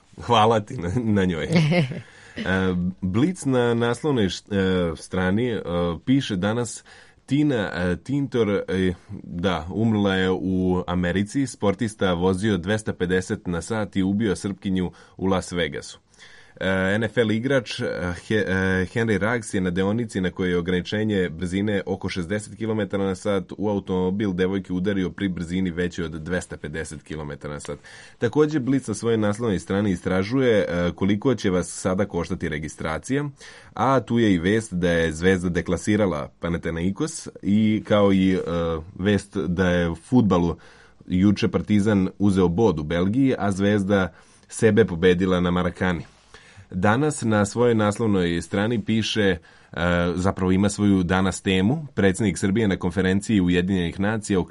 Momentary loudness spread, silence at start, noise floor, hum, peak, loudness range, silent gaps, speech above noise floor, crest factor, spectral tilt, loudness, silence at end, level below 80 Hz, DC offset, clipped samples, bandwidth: 8 LU; 0.15 s; -49 dBFS; none; -4 dBFS; 4 LU; none; 27 dB; 18 dB; -6 dB/octave; -23 LUFS; 0 s; -48 dBFS; under 0.1%; under 0.1%; 11.5 kHz